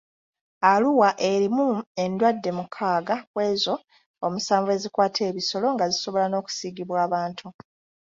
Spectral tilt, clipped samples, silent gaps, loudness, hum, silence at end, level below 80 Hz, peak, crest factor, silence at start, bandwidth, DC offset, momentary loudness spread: -4.5 dB/octave; under 0.1%; 1.87-1.95 s, 3.27-3.34 s, 3.84-3.88 s, 4.06-4.14 s; -24 LUFS; none; 0.6 s; -70 dBFS; -4 dBFS; 20 dB; 0.6 s; 7.8 kHz; under 0.1%; 10 LU